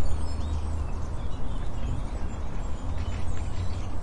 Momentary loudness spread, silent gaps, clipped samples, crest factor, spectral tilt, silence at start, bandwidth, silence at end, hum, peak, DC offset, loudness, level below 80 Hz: 4 LU; none; under 0.1%; 12 dB; -6.5 dB/octave; 0 s; 10 kHz; 0 s; none; -12 dBFS; under 0.1%; -34 LUFS; -32 dBFS